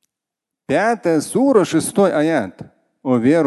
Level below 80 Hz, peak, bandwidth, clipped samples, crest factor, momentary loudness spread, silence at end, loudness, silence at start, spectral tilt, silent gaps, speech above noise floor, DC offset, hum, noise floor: -60 dBFS; -2 dBFS; 12.5 kHz; under 0.1%; 16 dB; 7 LU; 0 s; -17 LUFS; 0.7 s; -5.5 dB/octave; none; 68 dB; under 0.1%; none; -84 dBFS